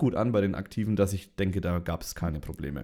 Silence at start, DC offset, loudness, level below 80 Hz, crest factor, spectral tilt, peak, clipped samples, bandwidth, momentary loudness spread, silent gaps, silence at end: 0 s; under 0.1%; -30 LUFS; -44 dBFS; 18 dB; -7 dB/octave; -12 dBFS; under 0.1%; 17.5 kHz; 8 LU; none; 0 s